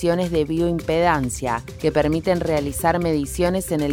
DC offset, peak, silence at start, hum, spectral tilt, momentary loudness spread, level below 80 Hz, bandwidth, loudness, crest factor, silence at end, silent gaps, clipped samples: under 0.1%; -4 dBFS; 0 s; none; -5.5 dB/octave; 4 LU; -38 dBFS; 18 kHz; -21 LUFS; 16 dB; 0 s; none; under 0.1%